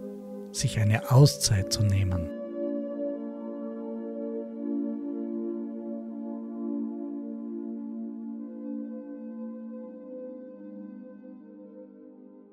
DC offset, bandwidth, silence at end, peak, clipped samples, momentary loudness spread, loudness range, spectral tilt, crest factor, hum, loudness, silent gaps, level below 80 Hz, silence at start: under 0.1%; 15.5 kHz; 0.05 s; -8 dBFS; under 0.1%; 20 LU; 15 LU; -5.5 dB/octave; 22 dB; none; -30 LUFS; none; -54 dBFS; 0 s